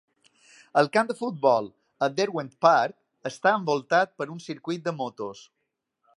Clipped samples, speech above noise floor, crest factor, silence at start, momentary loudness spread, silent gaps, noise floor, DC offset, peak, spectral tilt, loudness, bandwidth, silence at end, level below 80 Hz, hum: under 0.1%; 55 dB; 22 dB; 0.75 s; 15 LU; none; -80 dBFS; under 0.1%; -4 dBFS; -5 dB/octave; -25 LUFS; 11.5 kHz; 0.8 s; -78 dBFS; none